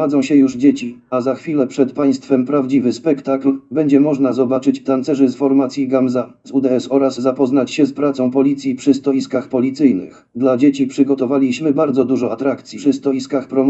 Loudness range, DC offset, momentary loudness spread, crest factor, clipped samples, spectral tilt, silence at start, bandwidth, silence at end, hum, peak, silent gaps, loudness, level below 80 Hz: 1 LU; under 0.1%; 6 LU; 16 dB; under 0.1%; -7 dB/octave; 0 s; 8.2 kHz; 0 s; none; 0 dBFS; none; -16 LUFS; -64 dBFS